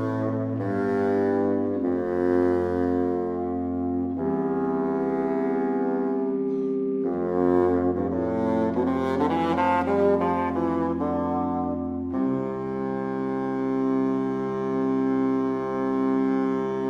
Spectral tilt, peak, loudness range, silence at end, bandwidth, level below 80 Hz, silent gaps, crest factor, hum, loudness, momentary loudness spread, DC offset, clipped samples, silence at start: -9 dB/octave; -8 dBFS; 3 LU; 0 s; 6.4 kHz; -54 dBFS; none; 16 dB; none; -25 LUFS; 5 LU; under 0.1%; under 0.1%; 0 s